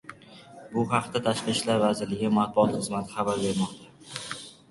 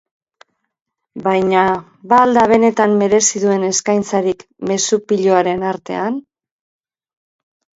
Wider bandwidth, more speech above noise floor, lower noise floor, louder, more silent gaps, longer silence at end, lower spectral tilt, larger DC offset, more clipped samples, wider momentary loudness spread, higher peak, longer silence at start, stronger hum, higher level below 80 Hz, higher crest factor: first, 11.5 kHz vs 8 kHz; second, 23 dB vs 38 dB; second, -49 dBFS vs -53 dBFS; second, -27 LUFS vs -15 LUFS; neither; second, 0.15 s vs 1.55 s; about the same, -5 dB/octave vs -4 dB/octave; neither; neither; first, 15 LU vs 11 LU; second, -8 dBFS vs 0 dBFS; second, 0.05 s vs 1.15 s; neither; about the same, -60 dBFS vs -56 dBFS; about the same, 20 dB vs 16 dB